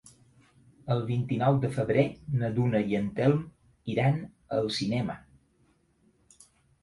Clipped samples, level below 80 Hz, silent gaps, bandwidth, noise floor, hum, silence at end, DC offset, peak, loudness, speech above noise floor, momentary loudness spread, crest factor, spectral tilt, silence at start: under 0.1%; -60 dBFS; none; 11.5 kHz; -67 dBFS; none; 1.65 s; under 0.1%; -10 dBFS; -28 LUFS; 40 dB; 9 LU; 18 dB; -7.5 dB/octave; 0.05 s